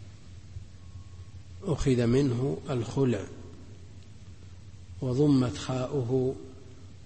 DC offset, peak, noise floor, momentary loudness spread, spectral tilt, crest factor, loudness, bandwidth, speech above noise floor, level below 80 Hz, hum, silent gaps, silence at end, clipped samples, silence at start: 0.3%; -14 dBFS; -48 dBFS; 25 LU; -7.5 dB/octave; 16 dB; -28 LUFS; 8.8 kHz; 21 dB; -48 dBFS; none; none; 0.05 s; under 0.1%; 0 s